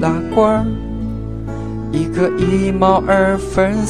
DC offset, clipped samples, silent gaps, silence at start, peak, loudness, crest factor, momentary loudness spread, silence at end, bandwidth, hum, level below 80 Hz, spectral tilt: 1%; under 0.1%; none; 0 s; 0 dBFS; -16 LUFS; 16 dB; 11 LU; 0 s; 11 kHz; none; -30 dBFS; -7 dB/octave